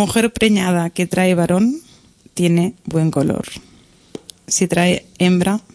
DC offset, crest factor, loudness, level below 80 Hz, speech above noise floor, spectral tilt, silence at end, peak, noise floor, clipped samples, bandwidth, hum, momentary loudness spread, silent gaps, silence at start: under 0.1%; 16 dB; -17 LUFS; -46 dBFS; 32 dB; -5 dB/octave; 0.15 s; 0 dBFS; -48 dBFS; under 0.1%; 11 kHz; none; 16 LU; none; 0 s